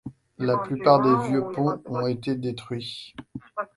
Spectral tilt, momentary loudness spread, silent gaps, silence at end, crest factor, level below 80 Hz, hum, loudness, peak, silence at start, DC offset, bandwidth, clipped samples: -7.5 dB/octave; 19 LU; none; 0.1 s; 22 dB; -62 dBFS; none; -24 LUFS; -2 dBFS; 0.05 s; under 0.1%; 11.5 kHz; under 0.1%